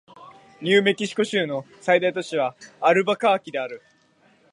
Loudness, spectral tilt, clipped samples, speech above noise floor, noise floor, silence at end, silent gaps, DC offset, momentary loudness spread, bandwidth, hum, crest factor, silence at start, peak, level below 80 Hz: -22 LUFS; -4.5 dB/octave; under 0.1%; 38 dB; -60 dBFS; 0.75 s; none; under 0.1%; 11 LU; 11.5 kHz; none; 20 dB; 0.2 s; -4 dBFS; -76 dBFS